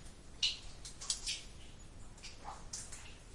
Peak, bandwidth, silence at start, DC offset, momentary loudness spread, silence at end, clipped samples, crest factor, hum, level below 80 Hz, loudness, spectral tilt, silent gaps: -18 dBFS; 11.5 kHz; 0 s; under 0.1%; 20 LU; 0 s; under 0.1%; 26 dB; none; -54 dBFS; -41 LUFS; -0.5 dB/octave; none